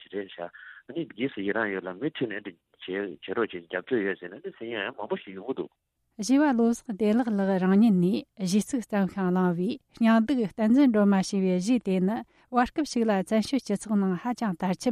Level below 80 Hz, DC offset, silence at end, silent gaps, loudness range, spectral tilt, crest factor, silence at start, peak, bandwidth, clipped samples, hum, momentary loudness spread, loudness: -62 dBFS; under 0.1%; 0 s; none; 8 LU; -6.5 dB/octave; 16 dB; 0.15 s; -10 dBFS; 13.5 kHz; under 0.1%; none; 14 LU; -27 LUFS